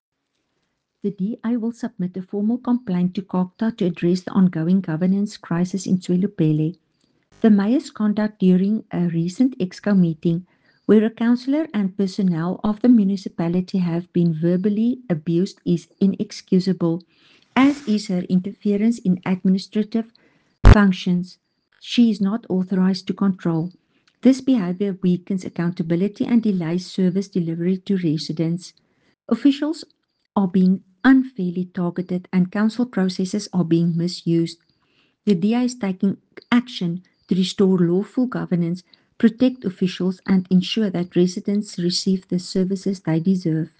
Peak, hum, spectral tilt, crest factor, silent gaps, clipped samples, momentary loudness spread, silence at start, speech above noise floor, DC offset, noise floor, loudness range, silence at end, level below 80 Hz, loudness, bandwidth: -2 dBFS; none; -7.5 dB/octave; 18 dB; none; under 0.1%; 8 LU; 1.05 s; 53 dB; under 0.1%; -73 dBFS; 3 LU; 0.15 s; -34 dBFS; -21 LUFS; 9 kHz